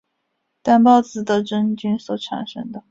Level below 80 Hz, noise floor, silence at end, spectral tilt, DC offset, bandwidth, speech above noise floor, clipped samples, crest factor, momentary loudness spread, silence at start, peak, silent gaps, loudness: -62 dBFS; -73 dBFS; 0.1 s; -6 dB/octave; under 0.1%; 7.8 kHz; 55 dB; under 0.1%; 18 dB; 15 LU; 0.65 s; -2 dBFS; none; -18 LUFS